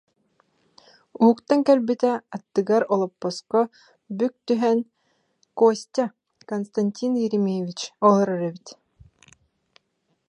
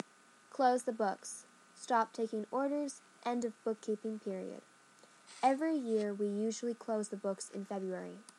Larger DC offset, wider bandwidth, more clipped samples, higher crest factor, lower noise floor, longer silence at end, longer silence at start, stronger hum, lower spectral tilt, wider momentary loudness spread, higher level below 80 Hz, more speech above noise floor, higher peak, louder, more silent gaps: neither; second, 10 kHz vs 12 kHz; neither; about the same, 20 dB vs 20 dB; first, -72 dBFS vs -63 dBFS; first, 1.55 s vs 0.15 s; first, 1.2 s vs 0.55 s; neither; first, -6.5 dB/octave vs -5 dB/octave; about the same, 12 LU vs 14 LU; first, -70 dBFS vs under -90 dBFS; first, 51 dB vs 27 dB; first, -4 dBFS vs -18 dBFS; first, -23 LUFS vs -37 LUFS; neither